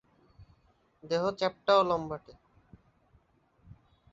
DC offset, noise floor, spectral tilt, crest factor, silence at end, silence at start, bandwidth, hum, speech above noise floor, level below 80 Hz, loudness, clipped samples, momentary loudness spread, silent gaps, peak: under 0.1%; -68 dBFS; -5.5 dB/octave; 22 dB; 1.8 s; 0.4 s; 7.8 kHz; none; 39 dB; -64 dBFS; -29 LUFS; under 0.1%; 13 LU; none; -10 dBFS